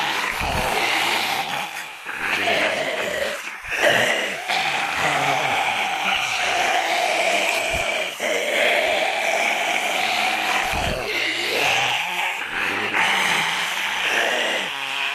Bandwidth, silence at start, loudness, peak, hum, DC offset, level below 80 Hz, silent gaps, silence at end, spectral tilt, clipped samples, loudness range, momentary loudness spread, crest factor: 14.5 kHz; 0 s; -20 LUFS; -4 dBFS; none; under 0.1%; -46 dBFS; none; 0 s; -1.5 dB/octave; under 0.1%; 2 LU; 5 LU; 16 dB